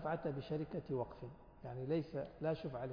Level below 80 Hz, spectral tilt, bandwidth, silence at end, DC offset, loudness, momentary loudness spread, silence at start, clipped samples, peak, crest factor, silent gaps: -64 dBFS; -7 dB/octave; 5.2 kHz; 0 s; under 0.1%; -43 LUFS; 12 LU; 0 s; under 0.1%; -28 dBFS; 14 dB; none